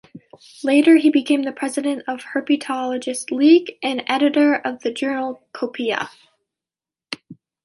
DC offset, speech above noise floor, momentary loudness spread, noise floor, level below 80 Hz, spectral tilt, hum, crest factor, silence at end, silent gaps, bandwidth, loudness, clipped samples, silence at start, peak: under 0.1%; over 71 dB; 14 LU; under -90 dBFS; -72 dBFS; -3.5 dB/octave; none; 18 dB; 0.3 s; none; 11.5 kHz; -19 LUFS; under 0.1%; 0.15 s; -2 dBFS